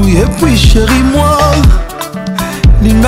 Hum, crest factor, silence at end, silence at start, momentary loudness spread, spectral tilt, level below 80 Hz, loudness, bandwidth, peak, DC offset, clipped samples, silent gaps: none; 8 dB; 0 s; 0 s; 9 LU; -5.5 dB/octave; -12 dBFS; -9 LUFS; 16.5 kHz; 0 dBFS; under 0.1%; under 0.1%; none